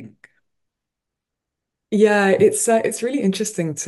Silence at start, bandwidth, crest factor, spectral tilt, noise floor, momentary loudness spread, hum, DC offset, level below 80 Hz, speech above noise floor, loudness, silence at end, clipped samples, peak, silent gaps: 0 s; 12 kHz; 18 dB; -4.5 dB/octave; -83 dBFS; 8 LU; none; under 0.1%; -68 dBFS; 66 dB; -18 LUFS; 0 s; under 0.1%; -2 dBFS; none